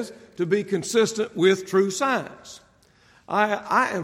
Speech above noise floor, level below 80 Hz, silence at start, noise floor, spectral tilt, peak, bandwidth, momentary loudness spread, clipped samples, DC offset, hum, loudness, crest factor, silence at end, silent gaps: 34 dB; -68 dBFS; 0 s; -57 dBFS; -4.5 dB/octave; -6 dBFS; 15.5 kHz; 15 LU; under 0.1%; under 0.1%; none; -23 LUFS; 18 dB; 0 s; none